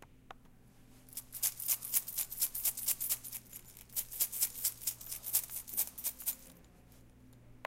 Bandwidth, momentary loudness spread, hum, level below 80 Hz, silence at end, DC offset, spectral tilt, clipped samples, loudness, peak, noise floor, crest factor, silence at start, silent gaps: 17 kHz; 13 LU; none; -64 dBFS; 0 s; under 0.1%; 0.5 dB/octave; under 0.1%; -35 LUFS; -12 dBFS; -60 dBFS; 26 dB; 0 s; none